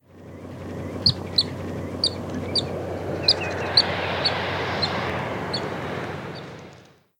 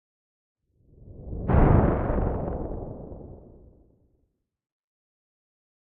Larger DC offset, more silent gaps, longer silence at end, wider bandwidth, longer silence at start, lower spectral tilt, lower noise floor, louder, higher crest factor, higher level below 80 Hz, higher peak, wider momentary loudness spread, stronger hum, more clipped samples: neither; neither; second, 0.35 s vs 2.6 s; first, 16.5 kHz vs 3.5 kHz; second, 0.1 s vs 1 s; second, -4.5 dB/octave vs -10 dB/octave; second, -50 dBFS vs -74 dBFS; about the same, -24 LUFS vs -25 LUFS; about the same, 22 dB vs 22 dB; second, -54 dBFS vs -34 dBFS; about the same, -4 dBFS vs -6 dBFS; second, 17 LU vs 23 LU; neither; neither